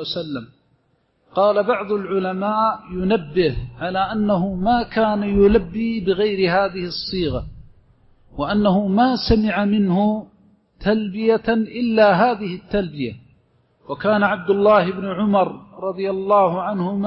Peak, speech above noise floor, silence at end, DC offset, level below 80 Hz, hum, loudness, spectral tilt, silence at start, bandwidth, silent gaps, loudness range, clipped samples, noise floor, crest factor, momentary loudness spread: -4 dBFS; 46 dB; 0 s; under 0.1%; -40 dBFS; none; -19 LUFS; -10 dB/octave; 0 s; 5.8 kHz; none; 2 LU; under 0.1%; -64 dBFS; 16 dB; 11 LU